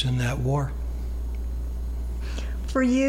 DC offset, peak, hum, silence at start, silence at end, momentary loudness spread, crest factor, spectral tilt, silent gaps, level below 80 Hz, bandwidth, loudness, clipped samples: under 0.1%; -12 dBFS; none; 0 s; 0 s; 8 LU; 14 dB; -6.5 dB/octave; none; -30 dBFS; 15.5 kHz; -29 LUFS; under 0.1%